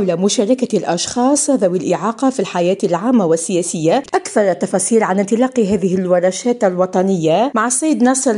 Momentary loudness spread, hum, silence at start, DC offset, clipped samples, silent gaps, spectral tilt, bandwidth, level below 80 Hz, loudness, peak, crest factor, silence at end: 3 LU; none; 0 s; under 0.1%; under 0.1%; none; -4.5 dB/octave; 14 kHz; -56 dBFS; -15 LUFS; -2 dBFS; 14 dB; 0 s